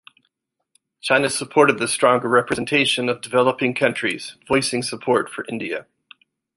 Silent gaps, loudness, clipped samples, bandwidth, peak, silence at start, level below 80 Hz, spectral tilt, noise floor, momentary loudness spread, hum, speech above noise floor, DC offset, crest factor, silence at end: none; -20 LUFS; under 0.1%; 11.5 kHz; -2 dBFS; 1.05 s; -60 dBFS; -3.5 dB/octave; -74 dBFS; 11 LU; none; 54 dB; under 0.1%; 20 dB; 0.75 s